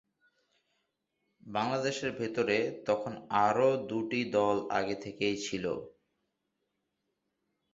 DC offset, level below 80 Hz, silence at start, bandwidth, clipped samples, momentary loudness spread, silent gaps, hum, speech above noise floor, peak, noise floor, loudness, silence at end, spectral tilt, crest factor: under 0.1%; -70 dBFS; 1.45 s; 8 kHz; under 0.1%; 7 LU; none; none; 51 dB; -12 dBFS; -82 dBFS; -32 LUFS; 1.85 s; -5 dB/octave; 20 dB